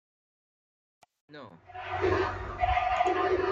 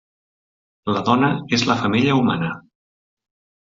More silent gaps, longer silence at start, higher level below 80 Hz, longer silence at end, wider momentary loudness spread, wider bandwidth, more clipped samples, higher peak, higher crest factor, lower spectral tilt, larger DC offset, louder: neither; first, 1.3 s vs 0.85 s; first, -46 dBFS vs -58 dBFS; second, 0 s vs 1.1 s; first, 22 LU vs 10 LU; about the same, 7.8 kHz vs 7.6 kHz; neither; second, -14 dBFS vs -2 dBFS; about the same, 18 dB vs 18 dB; about the same, -6.5 dB/octave vs -5.5 dB/octave; neither; second, -29 LUFS vs -19 LUFS